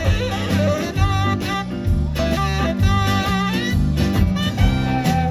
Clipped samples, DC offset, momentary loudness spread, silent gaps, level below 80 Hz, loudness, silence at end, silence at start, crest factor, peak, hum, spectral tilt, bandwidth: under 0.1%; under 0.1%; 3 LU; none; -26 dBFS; -19 LUFS; 0 s; 0 s; 14 dB; -4 dBFS; none; -6 dB/octave; 14.5 kHz